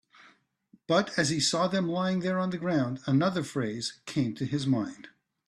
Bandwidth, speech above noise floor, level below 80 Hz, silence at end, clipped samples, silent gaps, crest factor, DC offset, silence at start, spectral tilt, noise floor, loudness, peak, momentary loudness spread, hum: 12.5 kHz; 36 dB; -68 dBFS; 0.4 s; under 0.1%; none; 18 dB; under 0.1%; 0.9 s; -5 dB/octave; -64 dBFS; -29 LUFS; -10 dBFS; 7 LU; none